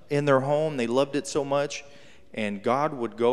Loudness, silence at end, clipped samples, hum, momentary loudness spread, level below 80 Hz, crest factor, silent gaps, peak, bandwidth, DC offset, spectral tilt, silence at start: -26 LUFS; 0 s; under 0.1%; none; 10 LU; -66 dBFS; 18 dB; none; -8 dBFS; 12.5 kHz; 0.4%; -5.5 dB/octave; 0.1 s